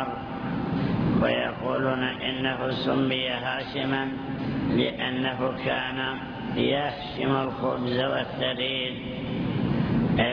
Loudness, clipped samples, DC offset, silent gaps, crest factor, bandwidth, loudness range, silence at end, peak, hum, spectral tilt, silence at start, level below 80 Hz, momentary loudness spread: -27 LUFS; under 0.1%; under 0.1%; none; 16 dB; 5.4 kHz; 1 LU; 0 s; -10 dBFS; none; -8.5 dB/octave; 0 s; -48 dBFS; 6 LU